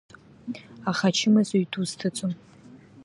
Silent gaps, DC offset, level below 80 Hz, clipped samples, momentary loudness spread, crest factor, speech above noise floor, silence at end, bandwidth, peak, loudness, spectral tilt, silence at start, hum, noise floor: none; under 0.1%; -68 dBFS; under 0.1%; 18 LU; 18 dB; 25 dB; 0 s; 11.5 kHz; -10 dBFS; -25 LUFS; -5 dB/octave; 0.45 s; none; -50 dBFS